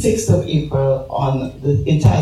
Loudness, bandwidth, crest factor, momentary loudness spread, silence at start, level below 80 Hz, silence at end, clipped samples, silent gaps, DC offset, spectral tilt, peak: -17 LUFS; 14 kHz; 16 dB; 5 LU; 0 s; -34 dBFS; 0 s; under 0.1%; none; under 0.1%; -7 dB/octave; 0 dBFS